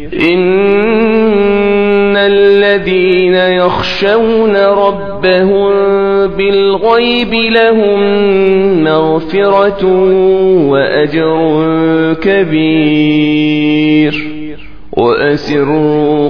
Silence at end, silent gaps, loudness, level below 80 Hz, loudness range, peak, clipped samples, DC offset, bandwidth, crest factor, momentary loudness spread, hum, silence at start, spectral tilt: 0 s; none; -9 LUFS; -38 dBFS; 2 LU; 0 dBFS; 0.2%; 3%; 5.4 kHz; 10 dB; 3 LU; none; 0 s; -7.5 dB/octave